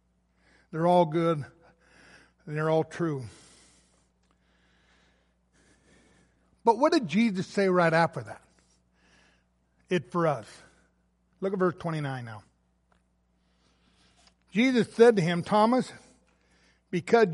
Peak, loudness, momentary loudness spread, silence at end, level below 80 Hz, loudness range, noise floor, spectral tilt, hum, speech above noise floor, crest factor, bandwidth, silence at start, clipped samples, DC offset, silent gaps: -6 dBFS; -26 LUFS; 17 LU; 0 s; -68 dBFS; 9 LU; -70 dBFS; -6.5 dB/octave; none; 45 dB; 22 dB; 11.5 kHz; 0.75 s; under 0.1%; under 0.1%; none